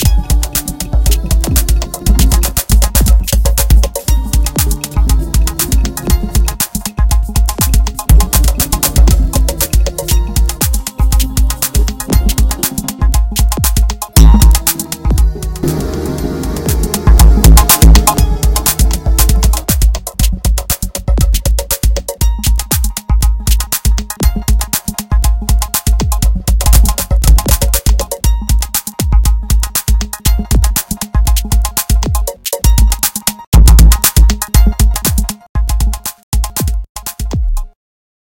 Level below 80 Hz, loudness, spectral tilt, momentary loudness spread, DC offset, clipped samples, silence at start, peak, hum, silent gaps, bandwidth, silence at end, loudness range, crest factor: -12 dBFS; -12 LUFS; -4 dB/octave; 8 LU; under 0.1%; 1%; 0 s; 0 dBFS; none; 33.47-33.52 s, 35.49-35.55 s, 36.23-36.32 s, 36.89-36.95 s; 17.5 kHz; 0.65 s; 4 LU; 10 dB